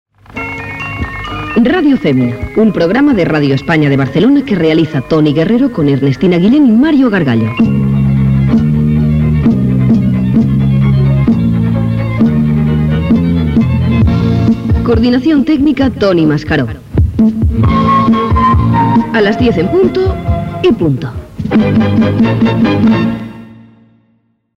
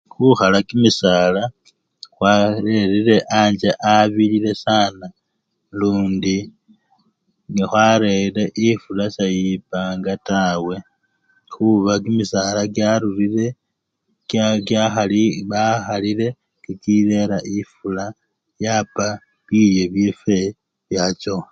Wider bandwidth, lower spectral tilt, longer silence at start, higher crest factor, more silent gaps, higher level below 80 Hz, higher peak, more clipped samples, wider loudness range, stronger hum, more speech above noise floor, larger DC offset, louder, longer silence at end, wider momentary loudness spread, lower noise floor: about the same, 7.2 kHz vs 7.8 kHz; first, -9 dB/octave vs -5.5 dB/octave; about the same, 0.3 s vs 0.2 s; second, 10 dB vs 18 dB; neither; first, -24 dBFS vs -50 dBFS; about the same, 0 dBFS vs 0 dBFS; neither; second, 2 LU vs 5 LU; neither; second, 47 dB vs 57 dB; neither; first, -11 LUFS vs -18 LUFS; first, 1.05 s vs 0.05 s; second, 5 LU vs 11 LU; second, -56 dBFS vs -74 dBFS